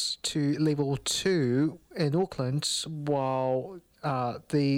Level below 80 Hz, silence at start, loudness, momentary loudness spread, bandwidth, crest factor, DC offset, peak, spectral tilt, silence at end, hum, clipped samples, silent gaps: -60 dBFS; 0 s; -29 LUFS; 6 LU; 16 kHz; 14 dB; under 0.1%; -14 dBFS; -5 dB/octave; 0 s; none; under 0.1%; none